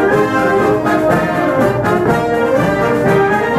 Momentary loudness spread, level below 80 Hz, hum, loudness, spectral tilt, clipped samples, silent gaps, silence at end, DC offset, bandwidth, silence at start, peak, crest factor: 2 LU; -38 dBFS; none; -13 LUFS; -7 dB/octave; under 0.1%; none; 0 s; under 0.1%; 15 kHz; 0 s; -2 dBFS; 12 dB